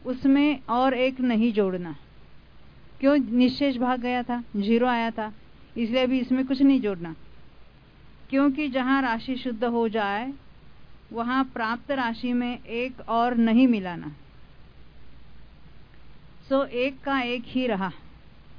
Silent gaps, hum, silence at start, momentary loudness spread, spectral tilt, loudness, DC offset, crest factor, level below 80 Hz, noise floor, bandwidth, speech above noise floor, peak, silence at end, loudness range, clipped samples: none; none; 0.05 s; 13 LU; -7.5 dB/octave; -25 LUFS; 0.4%; 18 dB; -54 dBFS; -50 dBFS; 5.4 kHz; 26 dB; -8 dBFS; 0.15 s; 5 LU; under 0.1%